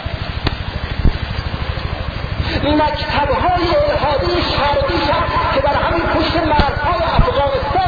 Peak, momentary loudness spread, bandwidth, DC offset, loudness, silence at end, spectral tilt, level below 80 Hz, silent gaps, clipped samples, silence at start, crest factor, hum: 0 dBFS; 8 LU; 5 kHz; under 0.1%; -17 LUFS; 0 s; -7.5 dB/octave; -24 dBFS; none; under 0.1%; 0 s; 16 dB; none